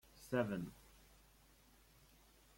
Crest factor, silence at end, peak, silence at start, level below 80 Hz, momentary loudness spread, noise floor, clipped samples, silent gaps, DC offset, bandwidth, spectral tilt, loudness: 22 dB; 1.8 s; -26 dBFS; 0.15 s; -70 dBFS; 27 LU; -68 dBFS; under 0.1%; none; under 0.1%; 16.5 kHz; -6.5 dB/octave; -43 LUFS